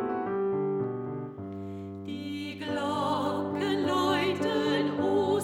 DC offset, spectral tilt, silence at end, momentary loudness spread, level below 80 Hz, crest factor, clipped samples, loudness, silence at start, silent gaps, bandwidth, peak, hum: under 0.1%; -6 dB/octave; 0 s; 12 LU; -68 dBFS; 14 dB; under 0.1%; -30 LUFS; 0 s; none; 16 kHz; -14 dBFS; none